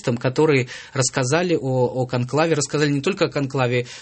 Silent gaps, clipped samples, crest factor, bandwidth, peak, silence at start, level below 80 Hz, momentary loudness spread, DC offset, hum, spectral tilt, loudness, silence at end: none; under 0.1%; 18 dB; 8.8 kHz; -4 dBFS; 0.05 s; -58 dBFS; 4 LU; under 0.1%; none; -5 dB/octave; -21 LUFS; 0 s